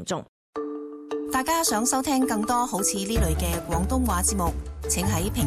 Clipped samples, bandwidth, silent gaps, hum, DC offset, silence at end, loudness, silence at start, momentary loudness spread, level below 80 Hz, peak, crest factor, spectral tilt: under 0.1%; 16 kHz; 0.28-0.53 s; none; under 0.1%; 0 s; -25 LUFS; 0 s; 11 LU; -34 dBFS; -12 dBFS; 14 dB; -4 dB/octave